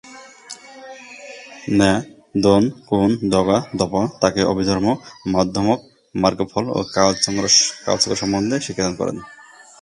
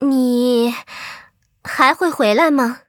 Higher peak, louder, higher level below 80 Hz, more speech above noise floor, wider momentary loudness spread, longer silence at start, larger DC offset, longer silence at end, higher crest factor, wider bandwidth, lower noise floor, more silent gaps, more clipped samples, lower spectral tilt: about the same, 0 dBFS vs 0 dBFS; second, -18 LUFS vs -15 LUFS; first, -46 dBFS vs -62 dBFS; second, 21 dB vs 31 dB; first, 20 LU vs 17 LU; about the same, 0.05 s vs 0 s; neither; first, 0.45 s vs 0.1 s; about the same, 20 dB vs 16 dB; second, 11.5 kHz vs 18.5 kHz; second, -40 dBFS vs -46 dBFS; neither; neither; about the same, -4 dB/octave vs -4 dB/octave